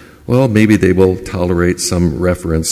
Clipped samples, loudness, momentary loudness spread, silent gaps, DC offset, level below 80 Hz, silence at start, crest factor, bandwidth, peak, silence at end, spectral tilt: under 0.1%; -13 LUFS; 6 LU; none; under 0.1%; -28 dBFS; 0.3 s; 12 dB; 16 kHz; 0 dBFS; 0 s; -6 dB/octave